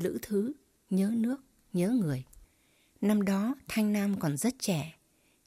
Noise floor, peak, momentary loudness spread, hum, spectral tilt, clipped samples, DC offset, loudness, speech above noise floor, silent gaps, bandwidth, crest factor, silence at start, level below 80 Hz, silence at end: -68 dBFS; -16 dBFS; 9 LU; none; -6 dB/octave; under 0.1%; under 0.1%; -31 LUFS; 39 dB; none; 16 kHz; 14 dB; 0 s; -64 dBFS; 0.55 s